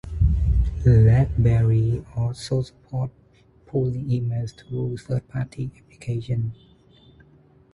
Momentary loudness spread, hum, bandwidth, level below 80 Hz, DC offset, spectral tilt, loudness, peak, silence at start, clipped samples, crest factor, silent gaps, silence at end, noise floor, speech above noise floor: 14 LU; none; 11 kHz; -30 dBFS; under 0.1%; -8.5 dB/octave; -23 LUFS; -6 dBFS; 0.05 s; under 0.1%; 18 dB; none; 1.2 s; -54 dBFS; 33 dB